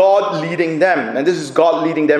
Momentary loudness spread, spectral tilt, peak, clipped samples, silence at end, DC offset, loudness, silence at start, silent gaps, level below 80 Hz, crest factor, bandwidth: 5 LU; -5.5 dB/octave; 0 dBFS; under 0.1%; 0 s; under 0.1%; -16 LUFS; 0 s; none; -64 dBFS; 14 dB; 11 kHz